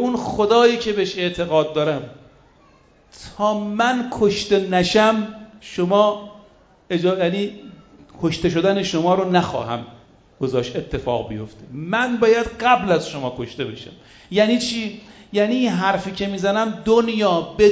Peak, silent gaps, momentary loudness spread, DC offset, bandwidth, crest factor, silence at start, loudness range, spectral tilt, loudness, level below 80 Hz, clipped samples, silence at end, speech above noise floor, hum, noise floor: -2 dBFS; none; 14 LU; under 0.1%; 8 kHz; 18 dB; 0 s; 3 LU; -5.5 dB/octave; -20 LUFS; -48 dBFS; under 0.1%; 0 s; 34 dB; none; -53 dBFS